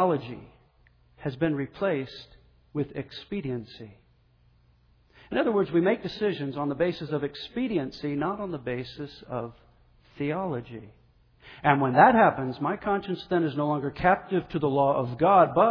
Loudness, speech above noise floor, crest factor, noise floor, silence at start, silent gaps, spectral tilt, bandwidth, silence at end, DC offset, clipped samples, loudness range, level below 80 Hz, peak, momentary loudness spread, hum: -26 LUFS; 36 dB; 22 dB; -62 dBFS; 0 s; none; -8.5 dB/octave; 5.4 kHz; 0 s; under 0.1%; under 0.1%; 11 LU; -56 dBFS; -4 dBFS; 17 LU; none